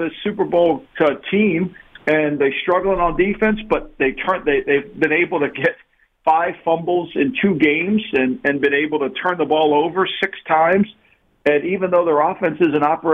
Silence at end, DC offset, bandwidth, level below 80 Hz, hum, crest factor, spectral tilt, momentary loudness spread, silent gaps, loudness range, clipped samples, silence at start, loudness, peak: 0 s; under 0.1%; 5.8 kHz; -44 dBFS; none; 14 dB; -8 dB/octave; 5 LU; none; 1 LU; under 0.1%; 0 s; -18 LUFS; -4 dBFS